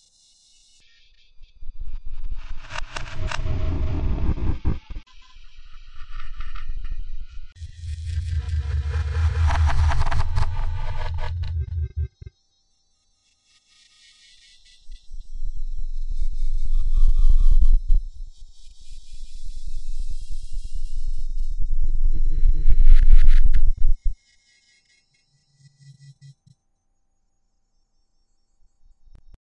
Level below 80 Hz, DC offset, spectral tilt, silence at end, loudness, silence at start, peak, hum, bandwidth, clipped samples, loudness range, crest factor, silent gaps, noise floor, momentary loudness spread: -20 dBFS; under 0.1%; -6 dB/octave; 5.3 s; -27 LUFS; 1.4 s; 0 dBFS; none; 5.8 kHz; under 0.1%; 14 LU; 18 dB; none; -68 dBFS; 23 LU